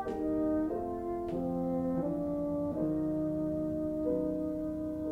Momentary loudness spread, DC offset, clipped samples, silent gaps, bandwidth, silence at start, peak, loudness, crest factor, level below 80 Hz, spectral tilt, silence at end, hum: 4 LU; under 0.1%; under 0.1%; none; 4.5 kHz; 0 s; -20 dBFS; -34 LUFS; 12 dB; -54 dBFS; -10 dB/octave; 0 s; none